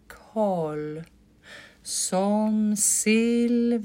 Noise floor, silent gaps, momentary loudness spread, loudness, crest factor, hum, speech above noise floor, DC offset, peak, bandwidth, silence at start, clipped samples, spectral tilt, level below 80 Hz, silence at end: -48 dBFS; none; 14 LU; -24 LUFS; 14 dB; none; 25 dB; under 0.1%; -10 dBFS; 16 kHz; 0.1 s; under 0.1%; -4 dB/octave; -62 dBFS; 0 s